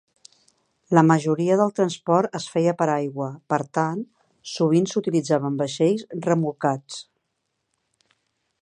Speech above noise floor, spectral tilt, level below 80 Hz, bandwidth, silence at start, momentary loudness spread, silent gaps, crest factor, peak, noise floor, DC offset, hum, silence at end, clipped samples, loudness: 55 dB; -6.5 dB/octave; -72 dBFS; 10 kHz; 0.9 s; 12 LU; none; 22 dB; 0 dBFS; -77 dBFS; under 0.1%; none; 1.6 s; under 0.1%; -22 LUFS